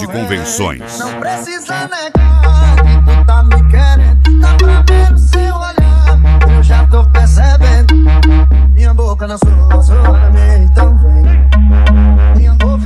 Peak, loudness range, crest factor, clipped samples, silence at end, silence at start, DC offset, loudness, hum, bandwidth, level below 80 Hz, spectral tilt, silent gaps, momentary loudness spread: 0 dBFS; 2 LU; 6 dB; under 0.1%; 0 s; 0 s; under 0.1%; -9 LUFS; none; 11 kHz; -6 dBFS; -6.5 dB/octave; none; 9 LU